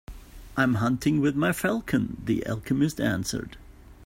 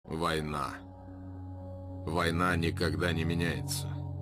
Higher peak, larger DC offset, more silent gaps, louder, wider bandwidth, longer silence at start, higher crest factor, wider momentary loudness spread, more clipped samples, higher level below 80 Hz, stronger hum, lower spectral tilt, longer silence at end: first, -10 dBFS vs -16 dBFS; neither; neither; first, -26 LUFS vs -32 LUFS; about the same, 16.5 kHz vs 15.5 kHz; about the same, 0.1 s vs 0.05 s; about the same, 18 dB vs 18 dB; second, 8 LU vs 16 LU; neither; about the same, -48 dBFS vs -50 dBFS; neither; about the same, -6 dB/octave vs -5.5 dB/octave; about the same, 0 s vs 0 s